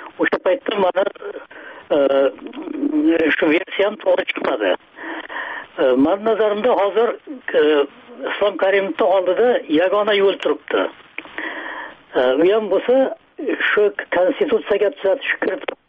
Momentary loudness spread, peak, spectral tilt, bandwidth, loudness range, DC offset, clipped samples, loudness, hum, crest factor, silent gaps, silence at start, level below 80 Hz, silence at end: 13 LU; -6 dBFS; -2 dB/octave; 5.2 kHz; 2 LU; under 0.1%; under 0.1%; -18 LUFS; none; 12 dB; none; 0 s; -60 dBFS; 0.15 s